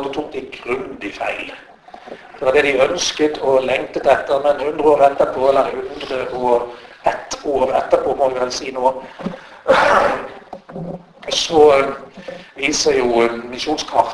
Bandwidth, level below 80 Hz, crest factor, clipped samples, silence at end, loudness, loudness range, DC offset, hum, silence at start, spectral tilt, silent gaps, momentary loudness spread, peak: 11 kHz; -48 dBFS; 18 dB; under 0.1%; 0 s; -17 LUFS; 4 LU; under 0.1%; none; 0 s; -3 dB/octave; none; 18 LU; 0 dBFS